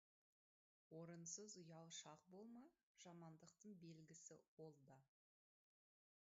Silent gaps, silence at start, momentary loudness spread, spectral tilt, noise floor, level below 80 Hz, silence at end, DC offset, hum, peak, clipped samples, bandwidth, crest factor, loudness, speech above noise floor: 2.83-2.95 s, 4.48-4.57 s; 0.9 s; 10 LU; -5 dB/octave; under -90 dBFS; under -90 dBFS; 1.25 s; under 0.1%; none; -42 dBFS; under 0.1%; 7.6 kHz; 22 dB; -61 LUFS; over 28 dB